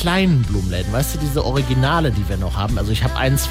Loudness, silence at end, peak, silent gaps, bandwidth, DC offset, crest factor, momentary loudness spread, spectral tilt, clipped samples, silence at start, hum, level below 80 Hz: -19 LUFS; 0 s; -6 dBFS; none; 16 kHz; under 0.1%; 12 dB; 5 LU; -5.5 dB/octave; under 0.1%; 0 s; none; -26 dBFS